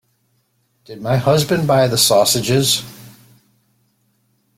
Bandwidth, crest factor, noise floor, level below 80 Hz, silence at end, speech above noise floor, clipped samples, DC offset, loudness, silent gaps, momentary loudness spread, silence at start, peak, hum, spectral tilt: 16.5 kHz; 18 dB; -64 dBFS; -52 dBFS; 1.5 s; 49 dB; under 0.1%; under 0.1%; -15 LUFS; none; 8 LU; 0.9 s; -2 dBFS; none; -4 dB/octave